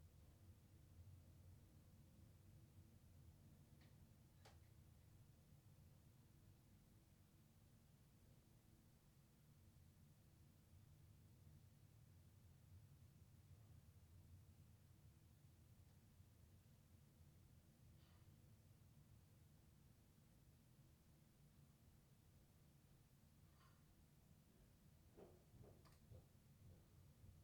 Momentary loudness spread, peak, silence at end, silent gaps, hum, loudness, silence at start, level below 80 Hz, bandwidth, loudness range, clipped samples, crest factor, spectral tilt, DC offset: 2 LU; -52 dBFS; 0 s; none; none; -69 LUFS; 0 s; -78 dBFS; 19.5 kHz; 1 LU; under 0.1%; 16 dB; -6 dB/octave; under 0.1%